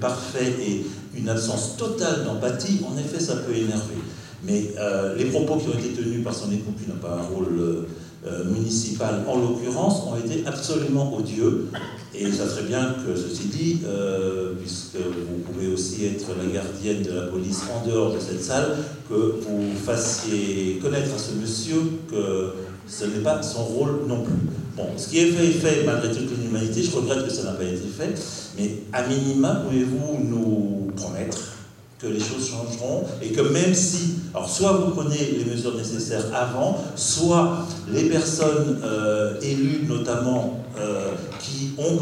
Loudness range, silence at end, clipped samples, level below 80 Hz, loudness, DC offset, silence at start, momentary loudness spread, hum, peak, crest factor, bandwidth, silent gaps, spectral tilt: 4 LU; 0 s; under 0.1%; -56 dBFS; -24 LUFS; under 0.1%; 0 s; 9 LU; none; -6 dBFS; 18 dB; 16 kHz; none; -5 dB/octave